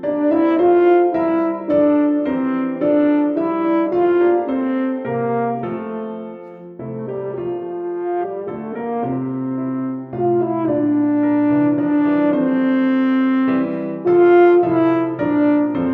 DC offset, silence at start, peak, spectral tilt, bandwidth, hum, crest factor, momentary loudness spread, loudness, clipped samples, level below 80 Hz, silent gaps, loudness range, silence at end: under 0.1%; 0 s; -2 dBFS; -10 dB/octave; 4.2 kHz; none; 14 dB; 12 LU; -17 LUFS; under 0.1%; -58 dBFS; none; 9 LU; 0 s